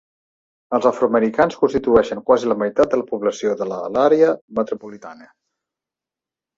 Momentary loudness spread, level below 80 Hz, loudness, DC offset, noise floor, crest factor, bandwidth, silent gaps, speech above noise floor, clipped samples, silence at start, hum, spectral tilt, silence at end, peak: 8 LU; -54 dBFS; -18 LUFS; under 0.1%; -88 dBFS; 18 dB; 7.6 kHz; 4.41-4.48 s; 70 dB; under 0.1%; 0.7 s; none; -6 dB/octave; 1.45 s; -2 dBFS